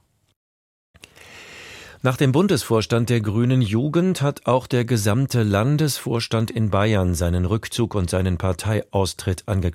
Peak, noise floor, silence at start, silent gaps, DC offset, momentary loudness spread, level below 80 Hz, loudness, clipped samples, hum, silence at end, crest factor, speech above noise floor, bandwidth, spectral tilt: -4 dBFS; -44 dBFS; 1.3 s; none; under 0.1%; 5 LU; -42 dBFS; -21 LUFS; under 0.1%; none; 0 s; 16 dB; 24 dB; 16 kHz; -6 dB/octave